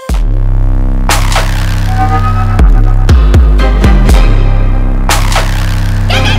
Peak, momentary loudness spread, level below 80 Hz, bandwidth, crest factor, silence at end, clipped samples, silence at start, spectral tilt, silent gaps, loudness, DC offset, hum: 0 dBFS; 6 LU; -8 dBFS; 15.5 kHz; 6 dB; 0 s; 2%; 0 s; -5 dB/octave; none; -10 LUFS; under 0.1%; none